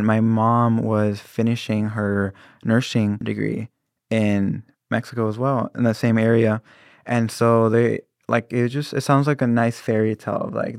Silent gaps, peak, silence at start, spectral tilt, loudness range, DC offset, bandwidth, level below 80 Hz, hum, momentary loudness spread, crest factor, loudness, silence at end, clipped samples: none; -4 dBFS; 0 s; -7.5 dB/octave; 3 LU; under 0.1%; 14.5 kHz; -68 dBFS; none; 9 LU; 16 dB; -21 LUFS; 0 s; under 0.1%